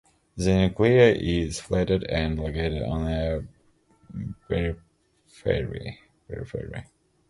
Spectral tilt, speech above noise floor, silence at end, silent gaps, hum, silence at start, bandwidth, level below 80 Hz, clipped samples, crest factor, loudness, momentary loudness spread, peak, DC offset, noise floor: -6.5 dB/octave; 37 dB; 0.45 s; none; none; 0.35 s; 11.5 kHz; -38 dBFS; under 0.1%; 22 dB; -25 LUFS; 21 LU; -4 dBFS; under 0.1%; -61 dBFS